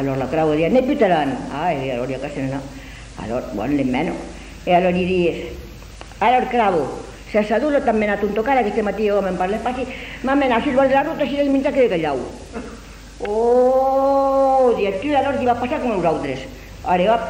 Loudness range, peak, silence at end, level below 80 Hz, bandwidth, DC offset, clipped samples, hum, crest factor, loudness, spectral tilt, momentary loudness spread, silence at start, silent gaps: 4 LU; -4 dBFS; 0 s; -40 dBFS; 16 kHz; under 0.1%; under 0.1%; none; 16 dB; -19 LUFS; -6.5 dB/octave; 17 LU; 0 s; none